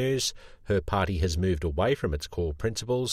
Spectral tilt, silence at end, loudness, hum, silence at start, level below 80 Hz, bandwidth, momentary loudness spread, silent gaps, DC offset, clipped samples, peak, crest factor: -5 dB/octave; 0 s; -28 LUFS; none; 0 s; -40 dBFS; 15.5 kHz; 5 LU; none; under 0.1%; under 0.1%; -12 dBFS; 14 dB